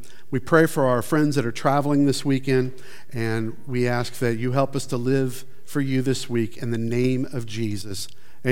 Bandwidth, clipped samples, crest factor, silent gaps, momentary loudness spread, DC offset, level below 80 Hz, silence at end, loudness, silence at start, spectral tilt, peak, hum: 17 kHz; under 0.1%; 20 dB; none; 11 LU; 3%; -60 dBFS; 0 s; -24 LUFS; 0.3 s; -6 dB/octave; -2 dBFS; none